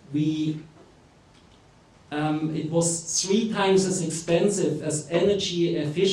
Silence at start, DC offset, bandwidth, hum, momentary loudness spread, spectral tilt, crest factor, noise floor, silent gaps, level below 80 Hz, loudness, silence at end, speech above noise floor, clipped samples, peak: 0.1 s; under 0.1%; 13.5 kHz; none; 7 LU; -4.5 dB/octave; 16 dB; -54 dBFS; none; -60 dBFS; -24 LUFS; 0 s; 31 dB; under 0.1%; -10 dBFS